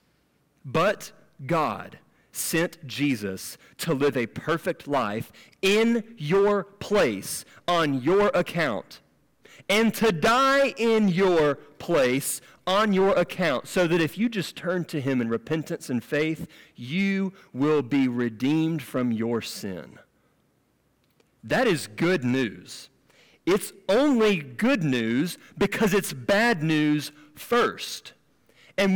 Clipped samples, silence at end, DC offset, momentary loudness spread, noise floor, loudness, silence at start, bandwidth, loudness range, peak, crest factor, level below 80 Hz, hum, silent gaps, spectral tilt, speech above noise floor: under 0.1%; 0 s; under 0.1%; 13 LU; -67 dBFS; -25 LUFS; 0.65 s; 18 kHz; 6 LU; -14 dBFS; 12 dB; -58 dBFS; none; none; -5 dB/octave; 43 dB